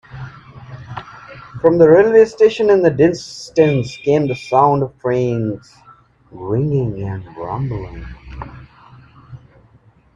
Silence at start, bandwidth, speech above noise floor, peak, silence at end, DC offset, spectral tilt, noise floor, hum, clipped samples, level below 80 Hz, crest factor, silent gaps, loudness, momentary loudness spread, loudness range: 0.1 s; 8 kHz; 36 dB; 0 dBFS; 0.8 s; under 0.1%; -7.5 dB/octave; -51 dBFS; none; under 0.1%; -44 dBFS; 16 dB; none; -15 LUFS; 24 LU; 11 LU